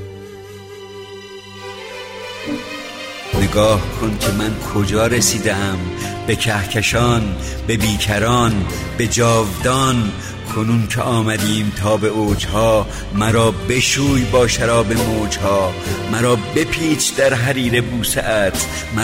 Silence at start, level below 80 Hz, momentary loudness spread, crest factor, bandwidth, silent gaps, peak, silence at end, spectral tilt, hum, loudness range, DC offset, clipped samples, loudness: 0 s; -32 dBFS; 15 LU; 14 dB; 16.5 kHz; none; -2 dBFS; 0 s; -4.5 dB/octave; none; 4 LU; under 0.1%; under 0.1%; -17 LUFS